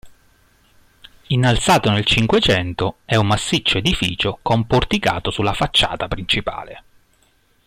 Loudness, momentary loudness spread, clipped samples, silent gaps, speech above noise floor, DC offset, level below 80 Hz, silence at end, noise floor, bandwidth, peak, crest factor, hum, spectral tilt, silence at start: -18 LUFS; 8 LU; under 0.1%; none; 41 dB; under 0.1%; -36 dBFS; 0.9 s; -59 dBFS; 16 kHz; -4 dBFS; 16 dB; none; -4.5 dB/octave; 0.05 s